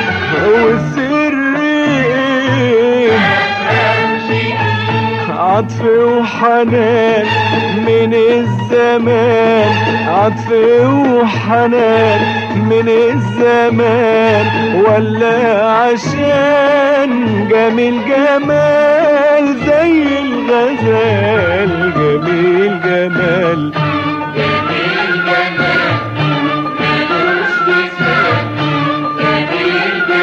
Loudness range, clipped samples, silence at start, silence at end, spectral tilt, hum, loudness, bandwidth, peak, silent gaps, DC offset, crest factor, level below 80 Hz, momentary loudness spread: 2 LU; under 0.1%; 0 s; 0 s; -6.5 dB/octave; none; -12 LUFS; 7.6 kHz; -2 dBFS; none; under 0.1%; 10 dB; -46 dBFS; 4 LU